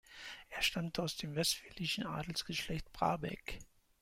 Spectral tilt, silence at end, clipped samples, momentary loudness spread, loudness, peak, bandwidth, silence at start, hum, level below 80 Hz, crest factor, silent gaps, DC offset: -3.5 dB/octave; 0.35 s; under 0.1%; 12 LU; -38 LUFS; -18 dBFS; 16.5 kHz; 0.1 s; none; -58 dBFS; 22 dB; none; under 0.1%